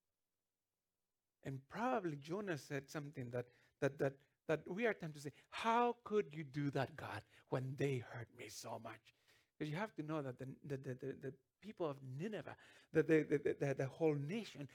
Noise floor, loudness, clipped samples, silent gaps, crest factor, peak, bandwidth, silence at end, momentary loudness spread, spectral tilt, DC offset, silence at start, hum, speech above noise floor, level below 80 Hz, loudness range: under -90 dBFS; -43 LUFS; under 0.1%; none; 20 dB; -22 dBFS; 17.5 kHz; 0 s; 15 LU; -6.5 dB/octave; under 0.1%; 1.45 s; none; over 48 dB; -82 dBFS; 7 LU